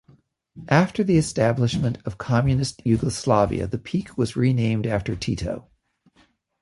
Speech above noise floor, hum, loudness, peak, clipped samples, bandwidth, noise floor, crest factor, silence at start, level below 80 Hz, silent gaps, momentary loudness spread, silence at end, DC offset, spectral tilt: 40 dB; none; -23 LUFS; -4 dBFS; under 0.1%; 11.5 kHz; -61 dBFS; 20 dB; 0.55 s; -44 dBFS; none; 8 LU; 1 s; under 0.1%; -6.5 dB/octave